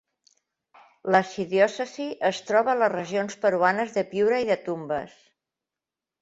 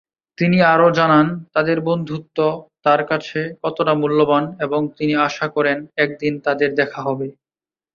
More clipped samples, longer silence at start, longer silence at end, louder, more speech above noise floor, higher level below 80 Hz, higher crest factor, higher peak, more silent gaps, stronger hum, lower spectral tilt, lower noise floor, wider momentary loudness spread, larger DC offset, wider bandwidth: neither; first, 1.05 s vs 0.4 s; first, 1.15 s vs 0.65 s; second, -25 LUFS vs -18 LUFS; second, 65 dB vs over 72 dB; second, -68 dBFS vs -60 dBFS; first, 22 dB vs 16 dB; about the same, -4 dBFS vs -2 dBFS; neither; neither; second, -5 dB/octave vs -7 dB/octave; about the same, -89 dBFS vs under -90 dBFS; about the same, 9 LU vs 10 LU; neither; first, 8 kHz vs 7 kHz